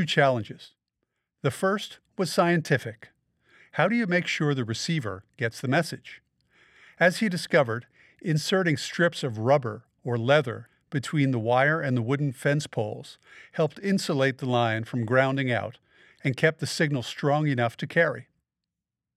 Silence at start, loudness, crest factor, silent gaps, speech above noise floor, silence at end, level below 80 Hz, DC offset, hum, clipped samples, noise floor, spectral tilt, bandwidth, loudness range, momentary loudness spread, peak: 0 s; -26 LUFS; 20 dB; none; 62 dB; 0.95 s; -72 dBFS; under 0.1%; none; under 0.1%; -87 dBFS; -5.5 dB/octave; 14 kHz; 2 LU; 12 LU; -6 dBFS